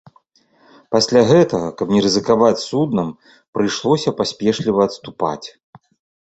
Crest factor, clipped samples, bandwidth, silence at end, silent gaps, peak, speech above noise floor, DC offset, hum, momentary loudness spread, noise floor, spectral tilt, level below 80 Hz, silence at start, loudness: 16 dB; under 0.1%; 8.2 kHz; 0.75 s; 3.48-3.53 s; -2 dBFS; 40 dB; under 0.1%; none; 10 LU; -56 dBFS; -5.5 dB/octave; -54 dBFS; 0.9 s; -17 LUFS